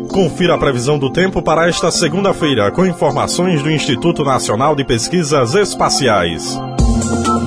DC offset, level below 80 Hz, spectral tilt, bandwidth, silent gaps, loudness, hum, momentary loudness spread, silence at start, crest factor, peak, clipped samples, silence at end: 0.2%; -28 dBFS; -4.5 dB/octave; 11 kHz; none; -14 LUFS; none; 3 LU; 0 s; 12 dB; 0 dBFS; under 0.1%; 0 s